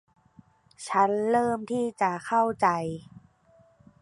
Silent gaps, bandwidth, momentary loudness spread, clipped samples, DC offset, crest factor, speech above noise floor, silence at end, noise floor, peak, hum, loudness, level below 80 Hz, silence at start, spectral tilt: none; 11.5 kHz; 11 LU; under 0.1%; under 0.1%; 20 dB; 35 dB; 1 s; -61 dBFS; -8 dBFS; none; -26 LUFS; -66 dBFS; 0.8 s; -5.5 dB/octave